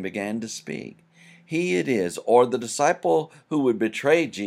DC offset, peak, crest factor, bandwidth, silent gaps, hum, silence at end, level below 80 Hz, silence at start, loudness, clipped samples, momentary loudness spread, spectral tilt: under 0.1%; -4 dBFS; 18 dB; 14.5 kHz; none; none; 0 s; -74 dBFS; 0 s; -23 LUFS; under 0.1%; 13 LU; -4.5 dB/octave